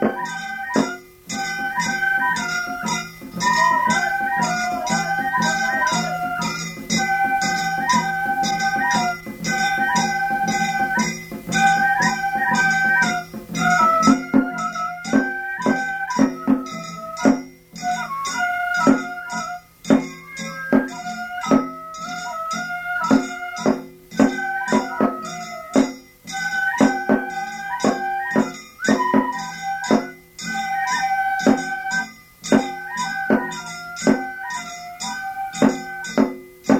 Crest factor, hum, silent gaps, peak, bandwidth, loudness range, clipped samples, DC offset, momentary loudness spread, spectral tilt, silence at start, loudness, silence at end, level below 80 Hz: 18 dB; none; none; -2 dBFS; 16.5 kHz; 4 LU; under 0.1%; under 0.1%; 12 LU; -4 dB/octave; 0 s; -21 LUFS; 0 s; -54 dBFS